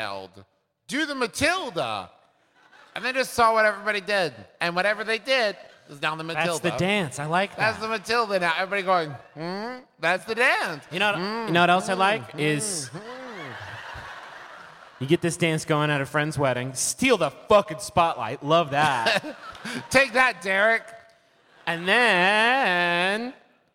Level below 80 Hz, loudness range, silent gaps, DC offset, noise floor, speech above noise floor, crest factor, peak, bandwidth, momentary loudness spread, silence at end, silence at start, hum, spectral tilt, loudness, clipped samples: -60 dBFS; 5 LU; none; under 0.1%; -60 dBFS; 36 dB; 20 dB; -6 dBFS; 16.5 kHz; 17 LU; 0.4 s; 0 s; none; -3.5 dB/octave; -23 LUFS; under 0.1%